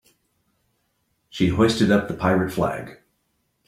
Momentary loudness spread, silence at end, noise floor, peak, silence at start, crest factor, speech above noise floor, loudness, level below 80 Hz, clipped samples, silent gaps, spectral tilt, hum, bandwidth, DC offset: 16 LU; 0.75 s; -71 dBFS; -4 dBFS; 1.35 s; 20 dB; 51 dB; -21 LUFS; -50 dBFS; under 0.1%; none; -6 dB/octave; none; 15 kHz; under 0.1%